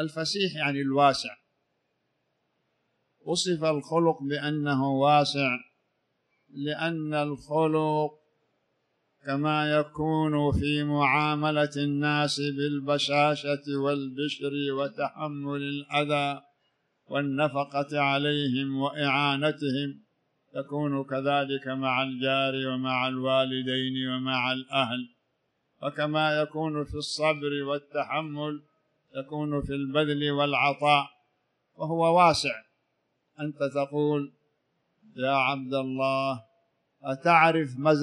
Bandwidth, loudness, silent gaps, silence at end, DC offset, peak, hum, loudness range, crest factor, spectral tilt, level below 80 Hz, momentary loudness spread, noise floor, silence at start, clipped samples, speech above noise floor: 11 kHz; -27 LUFS; none; 0 s; under 0.1%; -6 dBFS; none; 5 LU; 22 dB; -5.5 dB/octave; -56 dBFS; 11 LU; -76 dBFS; 0 s; under 0.1%; 50 dB